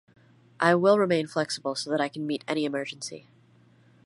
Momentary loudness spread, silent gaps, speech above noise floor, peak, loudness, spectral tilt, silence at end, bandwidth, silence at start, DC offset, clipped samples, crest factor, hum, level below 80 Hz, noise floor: 14 LU; none; 33 dB; -6 dBFS; -26 LUFS; -5 dB/octave; 0.85 s; 11.5 kHz; 0.6 s; under 0.1%; under 0.1%; 22 dB; none; -76 dBFS; -59 dBFS